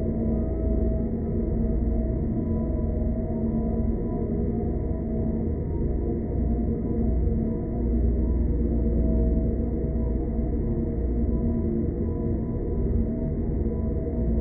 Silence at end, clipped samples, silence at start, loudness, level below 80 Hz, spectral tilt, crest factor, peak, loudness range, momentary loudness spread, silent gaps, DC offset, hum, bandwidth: 0 s; under 0.1%; 0 s; -27 LUFS; -28 dBFS; -15.5 dB/octave; 12 dB; -12 dBFS; 2 LU; 3 LU; none; under 0.1%; none; 2.3 kHz